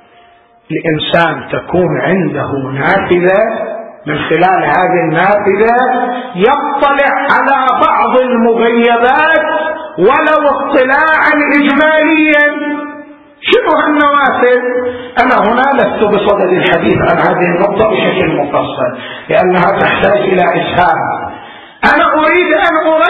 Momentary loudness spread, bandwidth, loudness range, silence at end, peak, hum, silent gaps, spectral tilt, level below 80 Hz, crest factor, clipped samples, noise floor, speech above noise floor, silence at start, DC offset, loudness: 9 LU; 7.2 kHz; 3 LU; 0 s; 0 dBFS; none; none; -7.5 dB/octave; -42 dBFS; 10 dB; 0.2%; -44 dBFS; 34 dB; 0.7 s; under 0.1%; -10 LUFS